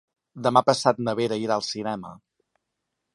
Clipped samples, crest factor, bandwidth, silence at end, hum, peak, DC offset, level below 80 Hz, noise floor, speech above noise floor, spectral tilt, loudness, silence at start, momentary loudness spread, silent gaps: under 0.1%; 24 dB; 11.5 kHz; 1 s; none; -2 dBFS; under 0.1%; -66 dBFS; -81 dBFS; 57 dB; -5 dB/octave; -24 LUFS; 0.35 s; 12 LU; none